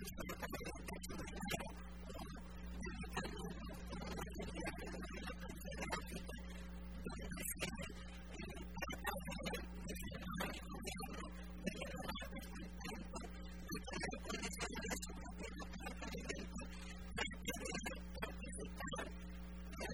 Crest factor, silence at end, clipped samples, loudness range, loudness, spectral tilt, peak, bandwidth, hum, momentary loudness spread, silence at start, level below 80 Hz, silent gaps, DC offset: 20 dB; 0 s; under 0.1%; 2 LU; -48 LUFS; -4 dB/octave; -28 dBFS; 19.5 kHz; none; 7 LU; 0 s; -52 dBFS; none; 0.1%